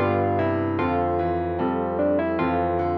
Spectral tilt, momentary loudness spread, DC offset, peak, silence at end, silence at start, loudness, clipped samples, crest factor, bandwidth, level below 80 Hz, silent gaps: -10.5 dB/octave; 2 LU; under 0.1%; -10 dBFS; 0 s; 0 s; -23 LUFS; under 0.1%; 12 dB; 5.4 kHz; -46 dBFS; none